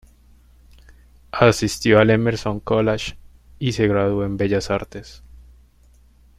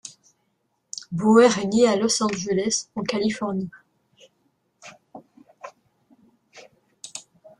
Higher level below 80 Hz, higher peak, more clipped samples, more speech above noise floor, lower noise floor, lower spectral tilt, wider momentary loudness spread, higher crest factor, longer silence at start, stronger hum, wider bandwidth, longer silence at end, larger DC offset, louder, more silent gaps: first, -44 dBFS vs -64 dBFS; about the same, -2 dBFS vs -4 dBFS; neither; second, 34 dB vs 52 dB; second, -52 dBFS vs -72 dBFS; first, -6 dB/octave vs -4 dB/octave; second, 13 LU vs 27 LU; about the same, 20 dB vs 20 dB; first, 1.35 s vs 0.05 s; neither; first, 15 kHz vs 11.5 kHz; first, 1 s vs 0.4 s; neither; about the same, -19 LUFS vs -21 LUFS; neither